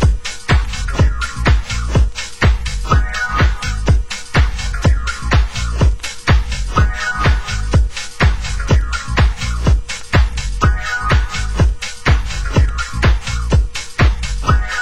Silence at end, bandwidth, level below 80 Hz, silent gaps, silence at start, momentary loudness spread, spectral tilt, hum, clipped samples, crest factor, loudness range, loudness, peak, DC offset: 0 s; 11.5 kHz; -16 dBFS; none; 0 s; 4 LU; -5 dB/octave; none; under 0.1%; 14 dB; 1 LU; -17 LUFS; 0 dBFS; 3%